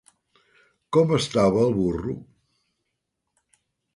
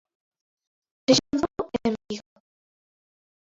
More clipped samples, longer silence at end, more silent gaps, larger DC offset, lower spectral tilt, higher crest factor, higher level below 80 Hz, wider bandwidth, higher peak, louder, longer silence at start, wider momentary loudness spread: neither; first, 1.7 s vs 1.4 s; neither; neither; first, -6.5 dB/octave vs -4 dB/octave; about the same, 20 dB vs 24 dB; first, -50 dBFS vs -58 dBFS; first, 11.5 kHz vs 8 kHz; about the same, -6 dBFS vs -6 dBFS; first, -22 LUFS vs -25 LUFS; second, 0.9 s vs 1.1 s; second, 12 LU vs 15 LU